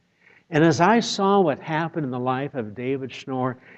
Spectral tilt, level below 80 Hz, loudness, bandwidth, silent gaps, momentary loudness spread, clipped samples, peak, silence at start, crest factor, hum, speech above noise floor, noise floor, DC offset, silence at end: -5.5 dB/octave; -66 dBFS; -23 LUFS; 8.6 kHz; none; 11 LU; under 0.1%; -2 dBFS; 0.5 s; 20 dB; none; 35 dB; -58 dBFS; under 0.1%; 0.25 s